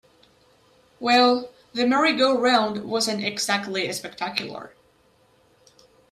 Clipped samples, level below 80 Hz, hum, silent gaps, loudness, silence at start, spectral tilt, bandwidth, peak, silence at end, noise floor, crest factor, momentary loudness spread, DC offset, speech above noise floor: under 0.1%; -68 dBFS; none; none; -22 LUFS; 1 s; -3 dB/octave; 15 kHz; -6 dBFS; 1.45 s; -60 dBFS; 18 dB; 12 LU; under 0.1%; 38 dB